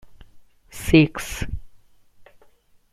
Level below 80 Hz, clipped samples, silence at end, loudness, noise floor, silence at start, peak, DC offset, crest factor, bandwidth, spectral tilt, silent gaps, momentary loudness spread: -38 dBFS; under 0.1%; 0.7 s; -21 LUFS; -55 dBFS; 0.05 s; -2 dBFS; under 0.1%; 22 dB; 15.5 kHz; -6 dB/octave; none; 21 LU